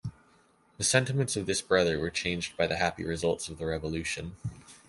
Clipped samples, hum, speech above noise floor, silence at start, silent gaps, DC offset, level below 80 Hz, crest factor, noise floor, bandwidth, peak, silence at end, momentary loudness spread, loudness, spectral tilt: under 0.1%; none; 34 dB; 0.05 s; none; under 0.1%; -50 dBFS; 22 dB; -64 dBFS; 12 kHz; -8 dBFS; 0.1 s; 10 LU; -29 LUFS; -3.5 dB/octave